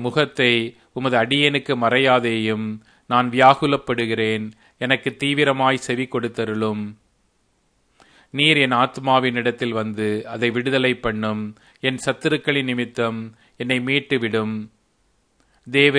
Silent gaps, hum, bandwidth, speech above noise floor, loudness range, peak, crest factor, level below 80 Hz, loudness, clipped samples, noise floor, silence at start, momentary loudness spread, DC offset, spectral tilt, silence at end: none; none; 10.5 kHz; 45 dB; 5 LU; 0 dBFS; 20 dB; -58 dBFS; -20 LUFS; under 0.1%; -65 dBFS; 0 s; 13 LU; under 0.1%; -5 dB/octave; 0 s